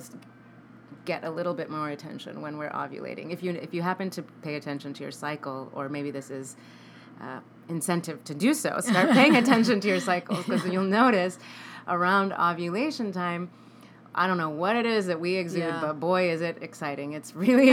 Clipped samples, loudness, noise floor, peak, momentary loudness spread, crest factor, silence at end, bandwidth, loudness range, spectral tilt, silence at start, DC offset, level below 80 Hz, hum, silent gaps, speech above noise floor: under 0.1%; -27 LUFS; -51 dBFS; -4 dBFS; 17 LU; 22 dB; 0 s; 17.5 kHz; 12 LU; -5 dB/octave; 0 s; under 0.1%; -84 dBFS; none; none; 25 dB